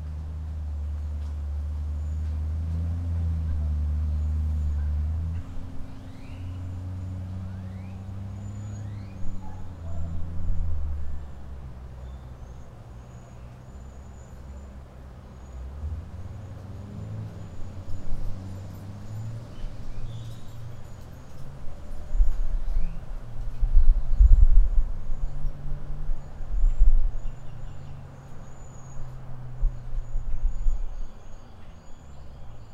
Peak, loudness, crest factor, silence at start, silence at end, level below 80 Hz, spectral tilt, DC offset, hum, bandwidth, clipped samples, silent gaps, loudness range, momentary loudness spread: -2 dBFS; -32 LUFS; 22 dB; 0 s; 0 s; -26 dBFS; -8 dB/octave; under 0.1%; none; 7.2 kHz; under 0.1%; none; 14 LU; 17 LU